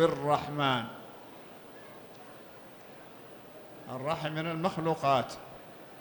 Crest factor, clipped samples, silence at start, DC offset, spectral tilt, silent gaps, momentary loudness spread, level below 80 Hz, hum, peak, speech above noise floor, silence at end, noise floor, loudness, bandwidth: 20 dB; under 0.1%; 0 s; under 0.1%; -6 dB/octave; none; 20 LU; -68 dBFS; none; -14 dBFS; 20 dB; 0 s; -50 dBFS; -31 LUFS; 19.5 kHz